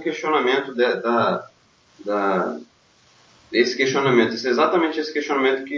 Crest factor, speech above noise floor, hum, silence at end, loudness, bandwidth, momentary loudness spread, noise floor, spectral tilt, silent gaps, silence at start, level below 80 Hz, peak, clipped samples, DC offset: 18 dB; 36 dB; none; 0 s; -20 LUFS; 7.2 kHz; 8 LU; -57 dBFS; -4.5 dB/octave; none; 0 s; -70 dBFS; -4 dBFS; under 0.1%; under 0.1%